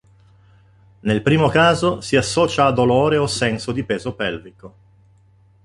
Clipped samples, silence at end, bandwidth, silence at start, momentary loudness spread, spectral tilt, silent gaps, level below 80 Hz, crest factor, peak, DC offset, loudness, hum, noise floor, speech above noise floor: under 0.1%; 0.95 s; 11.5 kHz; 1.05 s; 10 LU; -5 dB/octave; none; -46 dBFS; 18 dB; -2 dBFS; under 0.1%; -18 LUFS; none; -53 dBFS; 35 dB